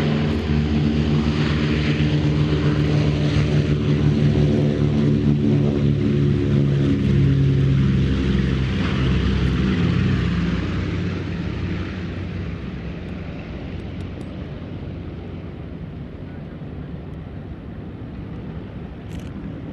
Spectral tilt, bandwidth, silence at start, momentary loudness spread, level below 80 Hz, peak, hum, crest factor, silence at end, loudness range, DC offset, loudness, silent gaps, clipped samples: -8 dB/octave; 7.6 kHz; 0 s; 16 LU; -30 dBFS; -6 dBFS; none; 16 dB; 0 s; 15 LU; under 0.1%; -20 LUFS; none; under 0.1%